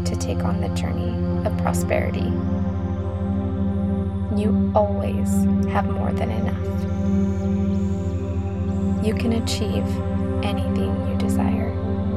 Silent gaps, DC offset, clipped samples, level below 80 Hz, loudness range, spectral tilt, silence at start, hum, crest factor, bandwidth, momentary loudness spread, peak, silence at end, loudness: none; 0.7%; under 0.1%; -34 dBFS; 2 LU; -7.5 dB/octave; 0 s; none; 16 dB; 13.5 kHz; 5 LU; -4 dBFS; 0 s; -23 LUFS